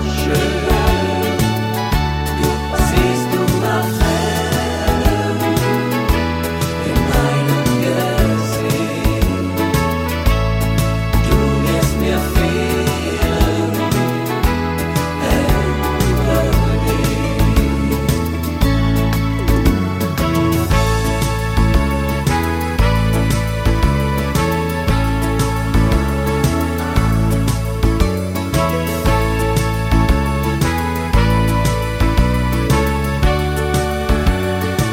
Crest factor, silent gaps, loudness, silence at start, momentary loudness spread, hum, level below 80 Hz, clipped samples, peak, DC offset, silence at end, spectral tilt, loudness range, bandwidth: 14 dB; none; -17 LUFS; 0 s; 3 LU; none; -20 dBFS; under 0.1%; -2 dBFS; under 0.1%; 0 s; -6 dB/octave; 1 LU; 17 kHz